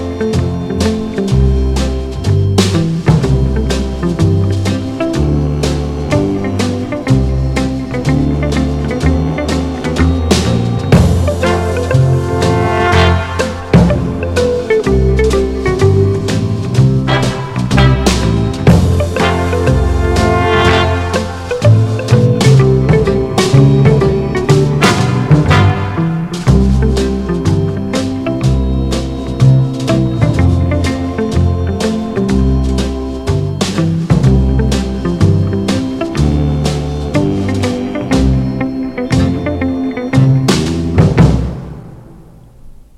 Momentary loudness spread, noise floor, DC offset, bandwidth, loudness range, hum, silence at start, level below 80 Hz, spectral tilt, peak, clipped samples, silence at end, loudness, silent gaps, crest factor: 7 LU; -37 dBFS; under 0.1%; 13 kHz; 4 LU; none; 0 s; -20 dBFS; -6.5 dB/octave; 0 dBFS; 0.5%; 0.25 s; -13 LUFS; none; 12 dB